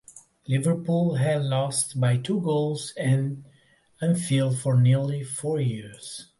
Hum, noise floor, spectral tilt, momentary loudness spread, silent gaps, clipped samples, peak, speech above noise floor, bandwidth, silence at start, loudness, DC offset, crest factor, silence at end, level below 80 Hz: none; -60 dBFS; -6 dB/octave; 10 LU; none; under 0.1%; -12 dBFS; 36 dB; 11.5 kHz; 0.15 s; -25 LUFS; under 0.1%; 14 dB; 0.15 s; -64 dBFS